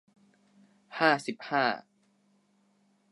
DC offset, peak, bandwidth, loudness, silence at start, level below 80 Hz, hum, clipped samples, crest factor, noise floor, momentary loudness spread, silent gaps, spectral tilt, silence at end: under 0.1%; -8 dBFS; 11.5 kHz; -29 LUFS; 0.9 s; -88 dBFS; 50 Hz at -65 dBFS; under 0.1%; 26 dB; -69 dBFS; 13 LU; none; -4.5 dB/octave; 1.3 s